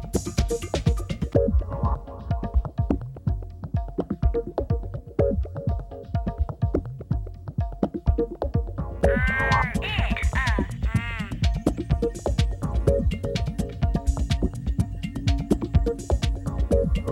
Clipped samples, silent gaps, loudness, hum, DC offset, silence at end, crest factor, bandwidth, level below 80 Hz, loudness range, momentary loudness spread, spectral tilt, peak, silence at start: under 0.1%; none; -26 LUFS; none; under 0.1%; 0 s; 18 dB; 13 kHz; -28 dBFS; 4 LU; 8 LU; -6.5 dB/octave; -6 dBFS; 0 s